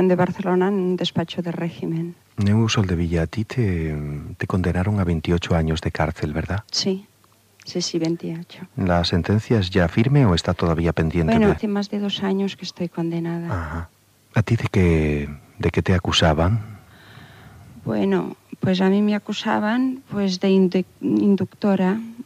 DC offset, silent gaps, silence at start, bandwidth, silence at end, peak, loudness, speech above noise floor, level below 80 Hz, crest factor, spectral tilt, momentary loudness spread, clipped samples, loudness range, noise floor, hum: under 0.1%; none; 0 s; 12.5 kHz; 0.05 s; -6 dBFS; -21 LUFS; 35 dB; -38 dBFS; 14 dB; -6.5 dB/octave; 10 LU; under 0.1%; 4 LU; -55 dBFS; none